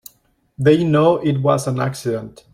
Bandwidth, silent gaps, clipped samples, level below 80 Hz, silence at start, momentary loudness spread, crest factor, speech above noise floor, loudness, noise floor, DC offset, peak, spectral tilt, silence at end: 16.5 kHz; none; under 0.1%; -54 dBFS; 0.6 s; 10 LU; 16 dB; 43 dB; -17 LUFS; -60 dBFS; under 0.1%; -2 dBFS; -7 dB/octave; 0.25 s